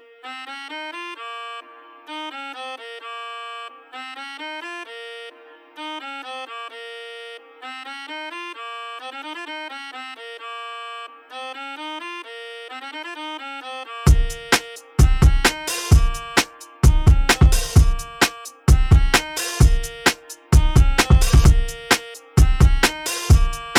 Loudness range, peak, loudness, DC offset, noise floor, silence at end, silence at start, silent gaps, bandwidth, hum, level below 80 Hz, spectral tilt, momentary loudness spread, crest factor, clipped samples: 16 LU; -4 dBFS; -19 LUFS; under 0.1%; -45 dBFS; 0 s; 0.25 s; none; 16.5 kHz; none; -22 dBFS; -4.5 dB/octave; 19 LU; 16 dB; under 0.1%